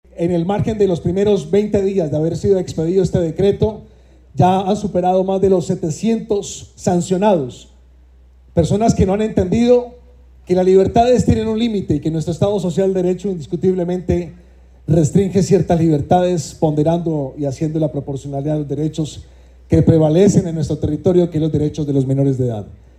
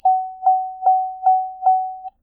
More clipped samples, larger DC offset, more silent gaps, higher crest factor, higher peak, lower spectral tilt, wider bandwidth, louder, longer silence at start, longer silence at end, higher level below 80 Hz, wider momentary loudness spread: neither; neither; neither; about the same, 14 dB vs 12 dB; first, -2 dBFS vs -8 dBFS; about the same, -7.5 dB/octave vs -7 dB/octave; first, 11 kHz vs 1.5 kHz; first, -16 LUFS vs -19 LUFS; about the same, 0.15 s vs 0.05 s; about the same, 0.25 s vs 0.15 s; first, -40 dBFS vs -66 dBFS; first, 8 LU vs 1 LU